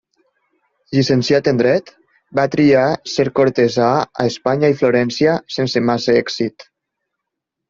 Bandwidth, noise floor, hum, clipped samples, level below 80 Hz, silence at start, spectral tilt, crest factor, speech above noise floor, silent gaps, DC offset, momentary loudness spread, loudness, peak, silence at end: 7.6 kHz; -80 dBFS; none; under 0.1%; -56 dBFS; 0.9 s; -6 dB/octave; 16 dB; 64 dB; none; under 0.1%; 6 LU; -16 LUFS; 0 dBFS; 1.05 s